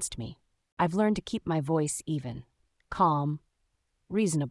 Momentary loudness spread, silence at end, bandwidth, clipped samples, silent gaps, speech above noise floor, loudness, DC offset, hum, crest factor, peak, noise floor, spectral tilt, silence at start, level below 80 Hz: 15 LU; 0 s; 12 kHz; under 0.1%; 0.72-0.77 s; 47 dB; -29 LUFS; under 0.1%; none; 20 dB; -12 dBFS; -76 dBFS; -5.5 dB/octave; 0 s; -56 dBFS